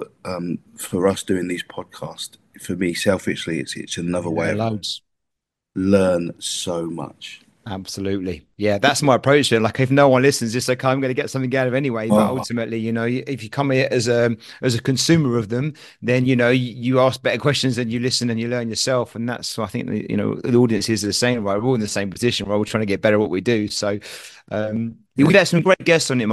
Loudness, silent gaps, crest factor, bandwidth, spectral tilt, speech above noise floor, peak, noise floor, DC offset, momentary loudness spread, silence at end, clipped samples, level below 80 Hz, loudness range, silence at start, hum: -20 LUFS; none; 20 dB; 12.5 kHz; -5 dB/octave; 61 dB; 0 dBFS; -81 dBFS; under 0.1%; 13 LU; 0 s; under 0.1%; -56 dBFS; 6 LU; 0 s; none